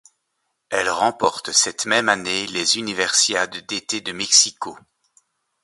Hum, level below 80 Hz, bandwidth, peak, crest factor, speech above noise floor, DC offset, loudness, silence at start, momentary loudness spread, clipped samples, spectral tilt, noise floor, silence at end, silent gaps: none; -62 dBFS; 12 kHz; 0 dBFS; 22 dB; 54 dB; under 0.1%; -19 LUFS; 0.7 s; 11 LU; under 0.1%; 0 dB/octave; -74 dBFS; 0.85 s; none